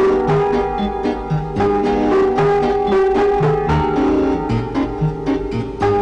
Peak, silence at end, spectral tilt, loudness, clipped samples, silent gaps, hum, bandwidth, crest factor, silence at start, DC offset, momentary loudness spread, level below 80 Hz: -10 dBFS; 0 s; -8 dB/octave; -17 LUFS; under 0.1%; none; none; 8.6 kHz; 6 dB; 0 s; under 0.1%; 6 LU; -32 dBFS